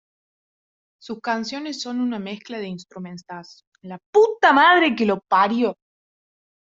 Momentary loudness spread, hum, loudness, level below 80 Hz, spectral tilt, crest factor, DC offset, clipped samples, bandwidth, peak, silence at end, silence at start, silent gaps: 22 LU; none; -19 LUFS; -70 dBFS; -4.5 dB/octave; 20 dB; under 0.1%; under 0.1%; 7.8 kHz; -2 dBFS; 0.9 s; 1.05 s; 3.67-3.72 s, 4.06-4.13 s